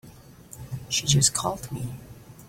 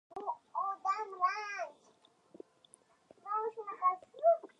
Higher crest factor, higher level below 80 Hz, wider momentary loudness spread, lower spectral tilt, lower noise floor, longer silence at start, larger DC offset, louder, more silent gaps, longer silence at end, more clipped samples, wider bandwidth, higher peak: about the same, 22 dB vs 18 dB; first, -52 dBFS vs under -90 dBFS; about the same, 23 LU vs 24 LU; about the same, -3 dB/octave vs -2.5 dB/octave; second, -48 dBFS vs -68 dBFS; about the same, 0.05 s vs 0.1 s; neither; first, -24 LUFS vs -36 LUFS; neither; second, 0 s vs 0.15 s; neither; first, 16.5 kHz vs 11 kHz; first, -6 dBFS vs -18 dBFS